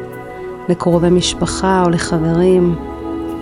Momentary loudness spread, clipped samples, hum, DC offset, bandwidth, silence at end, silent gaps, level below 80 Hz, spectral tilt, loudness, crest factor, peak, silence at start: 14 LU; under 0.1%; none; under 0.1%; 11.5 kHz; 0 s; none; -34 dBFS; -5.5 dB/octave; -15 LUFS; 14 dB; -2 dBFS; 0 s